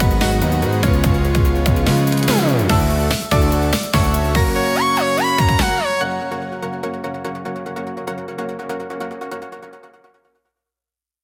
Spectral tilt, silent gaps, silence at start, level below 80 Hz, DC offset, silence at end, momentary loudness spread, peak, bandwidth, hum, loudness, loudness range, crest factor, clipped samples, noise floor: -5.5 dB/octave; none; 0 s; -26 dBFS; under 0.1%; 1.35 s; 12 LU; -2 dBFS; 18 kHz; none; -18 LUFS; 13 LU; 16 dB; under 0.1%; -89 dBFS